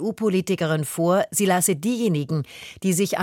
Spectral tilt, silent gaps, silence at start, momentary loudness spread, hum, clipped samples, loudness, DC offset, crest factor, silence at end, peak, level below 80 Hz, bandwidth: -5 dB/octave; none; 0 s; 8 LU; none; under 0.1%; -22 LUFS; under 0.1%; 14 dB; 0 s; -8 dBFS; -64 dBFS; 17 kHz